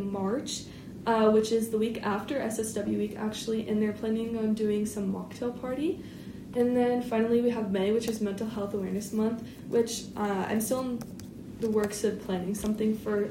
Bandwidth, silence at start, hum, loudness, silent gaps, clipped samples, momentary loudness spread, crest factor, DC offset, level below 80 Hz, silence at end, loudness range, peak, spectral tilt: 16 kHz; 0 s; none; -30 LUFS; none; under 0.1%; 10 LU; 16 dB; under 0.1%; -58 dBFS; 0 s; 2 LU; -12 dBFS; -5.5 dB/octave